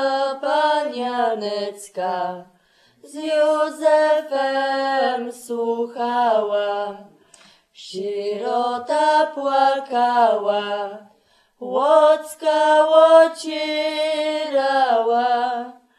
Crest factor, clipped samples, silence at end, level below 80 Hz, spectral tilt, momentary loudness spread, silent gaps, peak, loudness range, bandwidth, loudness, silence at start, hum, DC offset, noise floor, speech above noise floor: 18 dB; under 0.1%; 0.25 s; -78 dBFS; -3 dB/octave; 13 LU; none; -2 dBFS; 7 LU; 13 kHz; -19 LUFS; 0 s; none; under 0.1%; -59 dBFS; 40 dB